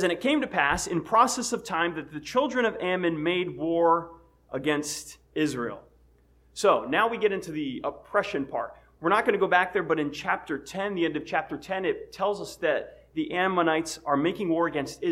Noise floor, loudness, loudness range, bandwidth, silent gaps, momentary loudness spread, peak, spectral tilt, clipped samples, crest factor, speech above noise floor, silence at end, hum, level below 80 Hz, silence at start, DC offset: -60 dBFS; -27 LUFS; 3 LU; 16 kHz; none; 11 LU; -8 dBFS; -4 dB/octave; under 0.1%; 20 dB; 33 dB; 0 s; none; -58 dBFS; 0 s; under 0.1%